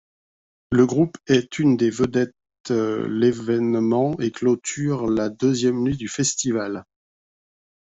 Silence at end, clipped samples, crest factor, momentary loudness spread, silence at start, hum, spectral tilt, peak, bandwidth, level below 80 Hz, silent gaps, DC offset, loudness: 1.15 s; under 0.1%; 18 dB; 6 LU; 0.7 s; none; -5.5 dB/octave; -4 dBFS; 8.2 kHz; -54 dBFS; 2.60-2.64 s; under 0.1%; -21 LUFS